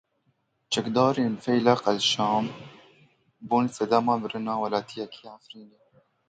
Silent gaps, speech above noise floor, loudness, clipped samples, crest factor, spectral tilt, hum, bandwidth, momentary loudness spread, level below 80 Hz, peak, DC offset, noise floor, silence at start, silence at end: none; 46 dB; -25 LUFS; under 0.1%; 20 dB; -4.5 dB/octave; none; 9.4 kHz; 16 LU; -68 dBFS; -6 dBFS; under 0.1%; -72 dBFS; 0.7 s; 0.6 s